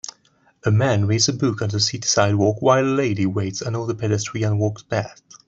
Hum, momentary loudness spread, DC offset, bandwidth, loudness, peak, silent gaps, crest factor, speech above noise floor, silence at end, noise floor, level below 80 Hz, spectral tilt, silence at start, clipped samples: none; 9 LU; under 0.1%; 7.8 kHz; -20 LUFS; -2 dBFS; none; 18 dB; 40 dB; 0.35 s; -60 dBFS; -58 dBFS; -5 dB/octave; 0.65 s; under 0.1%